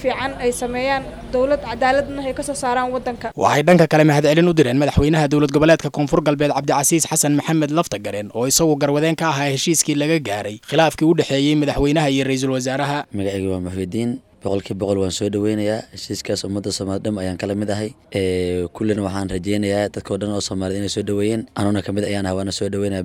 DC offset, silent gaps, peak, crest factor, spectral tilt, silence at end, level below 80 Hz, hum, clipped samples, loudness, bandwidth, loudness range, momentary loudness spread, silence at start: under 0.1%; none; -2 dBFS; 16 dB; -5 dB/octave; 0 s; -42 dBFS; none; under 0.1%; -19 LUFS; 16.5 kHz; 7 LU; 9 LU; 0 s